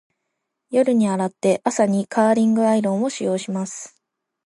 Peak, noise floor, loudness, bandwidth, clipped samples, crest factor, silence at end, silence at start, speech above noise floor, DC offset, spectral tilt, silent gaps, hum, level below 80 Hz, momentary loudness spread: -4 dBFS; -78 dBFS; -20 LUFS; 11.5 kHz; under 0.1%; 18 dB; 0.6 s; 0.7 s; 59 dB; under 0.1%; -6 dB/octave; none; none; -72 dBFS; 10 LU